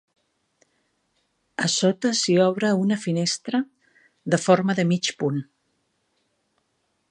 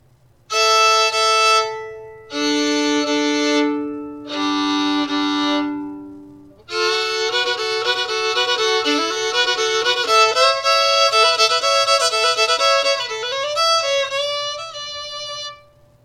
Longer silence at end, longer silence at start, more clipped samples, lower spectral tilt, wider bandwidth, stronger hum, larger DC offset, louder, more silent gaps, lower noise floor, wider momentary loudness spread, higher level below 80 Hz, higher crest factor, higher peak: first, 1.65 s vs 0.5 s; first, 1.6 s vs 0.5 s; neither; first, -4.5 dB/octave vs -0.5 dB/octave; second, 11 kHz vs 16 kHz; neither; neither; second, -22 LUFS vs -17 LUFS; neither; first, -72 dBFS vs -53 dBFS; second, 8 LU vs 14 LU; second, -72 dBFS vs -62 dBFS; first, 22 dB vs 16 dB; about the same, -4 dBFS vs -2 dBFS